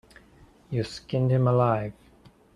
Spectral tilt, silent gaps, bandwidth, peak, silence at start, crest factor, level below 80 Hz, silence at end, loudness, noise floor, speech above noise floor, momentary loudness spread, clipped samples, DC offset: -8 dB/octave; none; 10.5 kHz; -8 dBFS; 0.7 s; 18 dB; -56 dBFS; 0.65 s; -25 LUFS; -56 dBFS; 32 dB; 11 LU; under 0.1%; under 0.1%